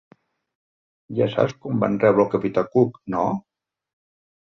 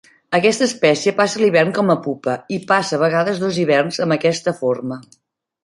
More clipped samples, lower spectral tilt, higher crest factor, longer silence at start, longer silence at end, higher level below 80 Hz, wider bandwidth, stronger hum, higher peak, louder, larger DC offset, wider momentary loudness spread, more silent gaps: neither; first, -8.5 dB/octave vs -5 dB/octave; about the same, 20 dB vs 16 dB; first, 1.1 s vs 0.3 s; first, 1.2 s vs 0.6 s; about the same, -60 dBFS vs -62 dBFS; second, 7 kHz vs 11.5 kHz; neither; about the same, -4 dBFS vs -2 dBFS; second, -22 LUFS vs -17 LUFS; neither; about the same, 7 LU vs 8 LU; neither